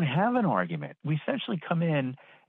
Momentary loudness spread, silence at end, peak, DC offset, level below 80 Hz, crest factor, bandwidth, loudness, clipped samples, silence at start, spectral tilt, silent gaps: 9 LU; 0.35 s; -12 dBFS; under 0.1%; -74 dBFS; 16 dB; 4.1 kHz; -29 LUFS; under 0.1%; 0 s; -10 dB/octave; none